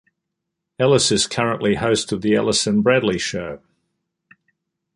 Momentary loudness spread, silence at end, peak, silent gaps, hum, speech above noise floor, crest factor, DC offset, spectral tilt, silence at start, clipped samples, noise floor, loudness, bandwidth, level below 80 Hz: 9 LU; 1.4 s; -2 dBFS; none; none; 61 dB; 18 dB; under 0.1%; -4 dB/octave; 0.8 s; under 0.1%; -80 dBFS; -18 LUFS; 11.5 kHz; -50 dBFS